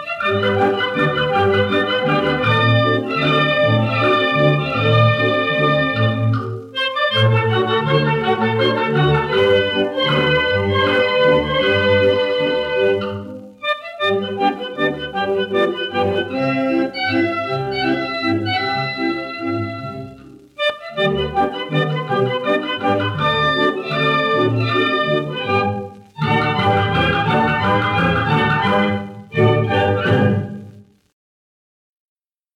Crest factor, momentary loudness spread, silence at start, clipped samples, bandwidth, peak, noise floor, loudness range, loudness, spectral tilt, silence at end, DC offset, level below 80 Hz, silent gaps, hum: 16 dB; 7 LU; 0 s; under 0.1%; 10 kHz; -2 dBFS; -42 dBFS; 5 LU; -17 LUFS; -7 dB/octave; 1.75 s; under 0.1%; -48 dBFS; none; none